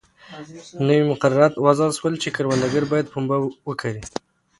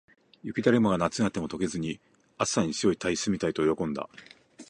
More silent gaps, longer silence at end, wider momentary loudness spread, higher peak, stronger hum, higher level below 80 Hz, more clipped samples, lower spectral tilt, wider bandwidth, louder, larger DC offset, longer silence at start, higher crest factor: neither; first, 0.4 s vs 0.05 s; first, 18 LU vs 12 LU; first, 0 dBFS vs -8 dBFS; neither; about the same, -56 dBFS vs -56 dBFS; neither; about the same, -6 dB/octave vs -5 dB/octave; about the same, 11.5 kHz vs 11 kHz; first, -20 LUFS vs -28 LUFS; neither; second, 0.3 s vs 0.45 s; about the same, 20 dB vs 20 dB